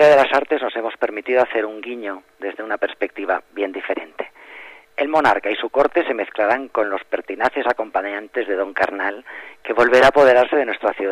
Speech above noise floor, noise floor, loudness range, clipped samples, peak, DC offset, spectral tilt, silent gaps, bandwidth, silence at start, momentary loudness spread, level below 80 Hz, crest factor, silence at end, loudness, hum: 22 dB; -41 dBFS; 7 LU; under 0.1%; -4 dBFS; under 0.1%; -4.5 dB/octave; none; 12.5 kHz; 0 s; 18 LU; -56 dBFS; 16 dB; 0 s; -19 LUFS; none